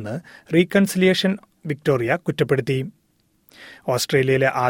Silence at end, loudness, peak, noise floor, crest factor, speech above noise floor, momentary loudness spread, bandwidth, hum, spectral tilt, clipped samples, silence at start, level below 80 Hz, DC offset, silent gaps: 0 s; -20 LUFS; -4 dBFS; -64 dBFS; 18 dB; 44 dB; 14 LU; 17 kHz; none; -5.5 dB/octave; under 0.1%; 0 s; -58 dBFS; under 0.1%; none